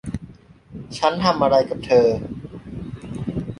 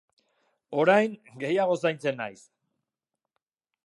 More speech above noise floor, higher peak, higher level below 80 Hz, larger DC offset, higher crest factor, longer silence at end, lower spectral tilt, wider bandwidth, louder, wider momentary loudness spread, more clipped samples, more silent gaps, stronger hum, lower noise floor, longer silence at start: second, 27 dB vs 61 dB; first, -2 dBFS vs -8 dBFS; first, -44 dBFS vs -82 dBFS; neither; about the same, 20 dB vs 22 dB; second, 0.05 s vs 1.55 s; about the same, -6 dB/octave vs -6 dB/octave; about the same, 11 kHz vs 11.5 kHz; first, -19 LUFS vs -26 LUFS; first, 18 LU vs 14 LU; neither; neither; neither; second, -45 dBFS vs -87 dBFS; second, 0.05 s vs 0.7 s